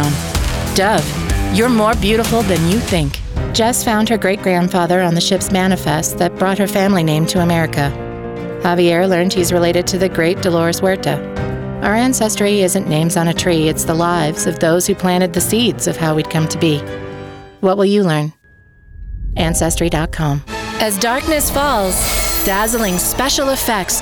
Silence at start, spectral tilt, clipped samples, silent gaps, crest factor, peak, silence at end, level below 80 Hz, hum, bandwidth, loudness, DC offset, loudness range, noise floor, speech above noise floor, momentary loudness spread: 0 s; -4.5 dB/octave; under 0.1%; none; 12 dB; -4 dBFS; 0 s; -30 dBFS; none; over 20 kHz; -15 LUFS; under 0.1%; 3 LU; -47 dBFS; 32 dB; 6 LU